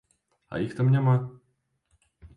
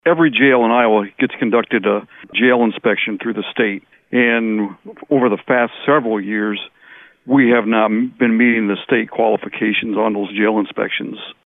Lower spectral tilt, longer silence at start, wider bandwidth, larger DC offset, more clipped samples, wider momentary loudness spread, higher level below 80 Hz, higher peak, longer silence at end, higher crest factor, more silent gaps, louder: about the same, -9.5 dB/octave vs -9 dB/octave; first, 0.5 s vs 0.05 s; first, 4.9 kHz vs 3.9 kHz; neither; neither; first, 15 LU vs 9 LU; about the same, -60 dBFS vs -64 dBFS; second, -14 dBFS vs -4 dBFS; about the same, 0.1 s vs 0.15 s; about the same, 14 dB vs 14 dB; neither; second, -25 LUFS vs -16 LUFS